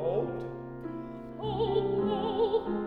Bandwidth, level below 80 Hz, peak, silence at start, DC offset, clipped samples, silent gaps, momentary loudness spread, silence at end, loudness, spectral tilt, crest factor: 4.9 kHz; -54 dBFS; -16 dBFS; 0 s; under 0.1%; under 0.1%; none; 12 LU; 0 s; -32 LUFS; -9 dB/octave; 14 dB